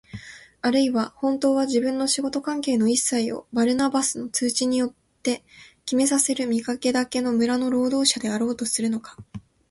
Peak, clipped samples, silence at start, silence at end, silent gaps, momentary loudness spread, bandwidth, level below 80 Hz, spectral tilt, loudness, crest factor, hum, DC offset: -4 dBFS; under 0.1%; 0.15 s; 0.3 s; none; 11 LU; 12 kHz; -62 dBFS; -3 dB/octave; -23 LUFS; 18 dB; none; under 0.1%